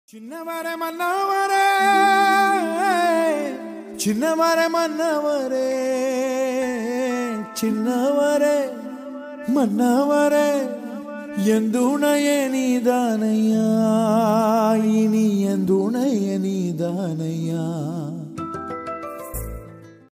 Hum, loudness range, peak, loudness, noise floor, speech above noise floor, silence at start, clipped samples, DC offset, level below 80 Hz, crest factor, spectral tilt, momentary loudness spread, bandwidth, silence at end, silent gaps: none; 5 LU; -6 dBFS; -20 LUFS; -42 dBFS; 23 dB; 0.15 s; under 0.1%; under 0.1%; -50 dBFS; 14 dB; -5.5 dB/octave; 13 LU; 16 kHz; 0.25 s; none